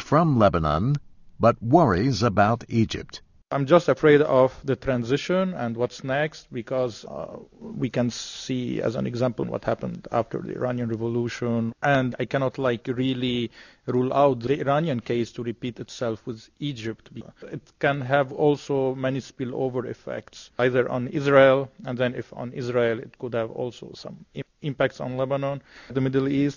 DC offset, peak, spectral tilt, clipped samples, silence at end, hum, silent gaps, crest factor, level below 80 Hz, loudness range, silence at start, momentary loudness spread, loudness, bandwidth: under 0.1%; -4 dBFS; -7 dB/octave; under 0.1%; 0 s; none; none; 20 dB; -50 dBFS; 7 LU; 0 s; 16 LU; -24 LUFS; 7.4 kHz